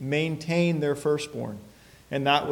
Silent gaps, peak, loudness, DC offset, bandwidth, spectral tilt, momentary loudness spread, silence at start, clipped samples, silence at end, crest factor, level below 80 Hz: none; -8 dBFS; -26 LUFS; under 0.1%; 16.5 kHz; -5.5 dB/octave; 12 LU; 0 s; under 0.1%; 0 s; 18 dB; -62 dBFS